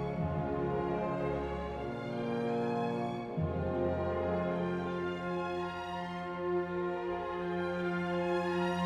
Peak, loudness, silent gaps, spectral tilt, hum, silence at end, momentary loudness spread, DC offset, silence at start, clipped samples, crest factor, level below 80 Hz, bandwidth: -22 dBFS; -35 LUFS; none; -8 dB/octave; none; 0 s; 5 LU; under 0.1%; 0 s; under 0.1%; 12 dB; -54 dBFS; 10 kHz